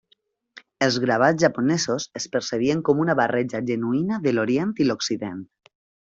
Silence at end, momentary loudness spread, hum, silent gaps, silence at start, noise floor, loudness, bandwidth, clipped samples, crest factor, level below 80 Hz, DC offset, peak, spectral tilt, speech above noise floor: 0.7 s; 8 LU; none; none; 0.55 s; -66 dBFS; -22 LUFS; 7.8 kHz; under 0.1%; 20 dB; -62 dBFS; under 0.1%; -4 dBFS; -5 dB/octave; 44 dB